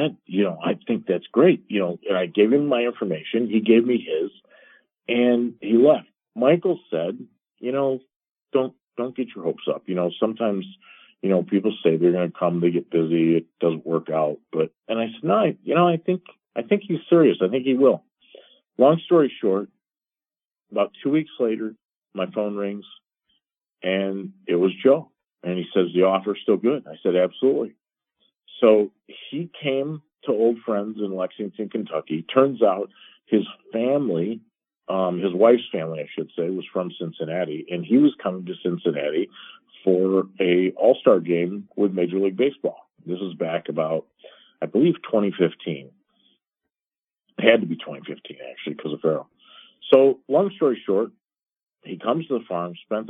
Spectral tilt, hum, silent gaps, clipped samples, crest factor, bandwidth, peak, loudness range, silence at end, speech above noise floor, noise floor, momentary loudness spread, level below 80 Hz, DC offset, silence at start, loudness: -9.5 dB/octave; none; 8.16-8.20 s, 20.47-20.51 s, 21.85-21.89 s, 21.98-22.02 s; under 0.1%; 22 dB; 3.9 kHz; 0 dBFS; 5 LU; 0 s; over 68 dB; under -90 dBFS; 13 LU; -78 dBFS; under 0.1%; 0 s; -22 LUFS